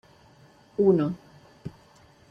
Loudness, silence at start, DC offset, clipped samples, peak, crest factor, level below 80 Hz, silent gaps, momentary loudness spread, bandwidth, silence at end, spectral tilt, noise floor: -24 LUFS; 0.8 s; under 0.1%; under 0.1%; -10 dBFS; 20 dB; -64 dBFS; none; 22 LU; 6.4 kHz; 0.6 s; -9.5 dB/octave; -56 dBFS